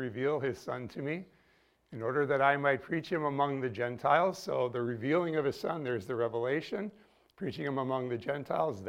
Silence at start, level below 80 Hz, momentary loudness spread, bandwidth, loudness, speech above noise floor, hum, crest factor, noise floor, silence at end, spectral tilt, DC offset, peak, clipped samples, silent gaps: 0 s; -72 dBFS; 11 LU; 16 kHz; -33 LUFS; 36 dB; none; 22 dB; -69 dBFS; 0 s; -6.5 dB/octave; under 0.1%; -12 dBFS; under 0.1%; none